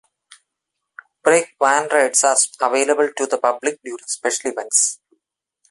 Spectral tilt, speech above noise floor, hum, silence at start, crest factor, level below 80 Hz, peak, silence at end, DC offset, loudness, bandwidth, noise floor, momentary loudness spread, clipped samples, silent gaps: -0.5 dB/octave; 61 dB; none; 1.25 s; 20 dB; -72 dBFS; 0 dBFS; 0.75 s; under 0.1%; -18 LUFS; 12 kHz; -80 dBFS; 10 LU; under 0.1%; none